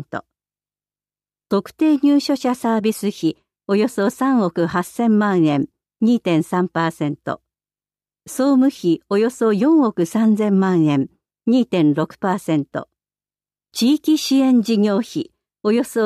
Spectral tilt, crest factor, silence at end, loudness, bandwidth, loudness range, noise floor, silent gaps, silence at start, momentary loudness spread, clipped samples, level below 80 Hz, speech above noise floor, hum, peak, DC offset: -6 dB/octave; 12 dB; 0 s; -18 LUFS; 14.5 kHz; 3 LU; under -90 dBFS; none; 0 s; 12 LU; under 0.1%; -64 dBFS; over 73 dB; 50 Hz at -45 dBFS; -6 dBFS; under 0.1%